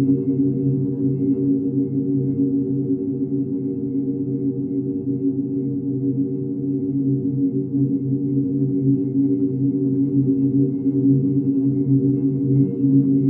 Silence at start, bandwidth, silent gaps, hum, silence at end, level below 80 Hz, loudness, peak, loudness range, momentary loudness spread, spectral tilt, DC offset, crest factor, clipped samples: 0 s; 1 kHz; none; none; 0 s; -56 dBFS; -21 LUFS; -6 dBFS; 4 LU; 6 LU; -16 dB/octave; under 0.1%; 14 dB; under 0.1%